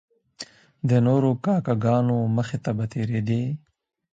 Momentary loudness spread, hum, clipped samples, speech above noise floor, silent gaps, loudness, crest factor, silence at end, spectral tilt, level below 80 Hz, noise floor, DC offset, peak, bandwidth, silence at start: 18 LU; none; under 0.1%; 22 dB; none; -23 LUFS; 14 dB; 0.55 s; -8.5 dB/octave; -58 dBFS; -44 dBFS; under 0.1%; -8 dBFS; 8 kHz; 0.4 s